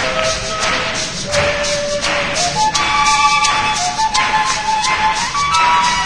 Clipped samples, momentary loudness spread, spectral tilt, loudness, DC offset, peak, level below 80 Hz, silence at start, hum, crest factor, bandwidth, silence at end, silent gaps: under 0.1%; 5 LU; -1.5 dB/octave; -14 LUFS; 1%; 0 dBFS; -36 dBFS; 0 s; none; 16 dB; 10.5 kHz; 0 s; none